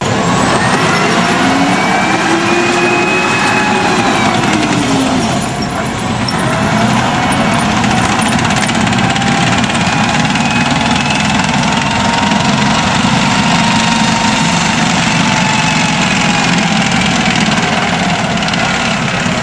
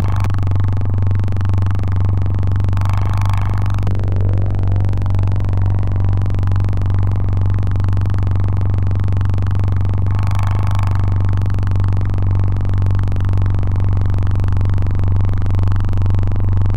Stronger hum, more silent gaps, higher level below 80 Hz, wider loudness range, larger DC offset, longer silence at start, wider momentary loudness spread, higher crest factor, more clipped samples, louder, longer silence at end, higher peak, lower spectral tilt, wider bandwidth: neither; neither; second, -34 dBFS vs -22 dBFS; about the same, 2 LU vs 0 LU; second, 0.4% vs 10%; about the same, 0 s vs 0 s; about the same, 2 LU vs 1 LU; about the same, 12 dB vs 10 dB; neither; first, -11 LUFS vs -17 LUFS; about the same, 0 s vs 0 s; first, 0 dBFS vs -6 dBFS; second, -4 dB/octave vs -8.5 dB/octave; first, 11 kHz vs 5 kHz